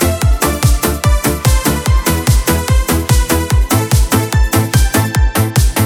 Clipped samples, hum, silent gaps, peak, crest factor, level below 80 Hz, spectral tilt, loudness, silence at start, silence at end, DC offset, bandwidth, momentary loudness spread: under 0.1%; none; none; 0 dBFS; 12 dB; -16 dBFS; -4.5 dB/octave; -13 LUFS; 0 s; 0 s; under 0.1%; over 20 kHz; 1 LU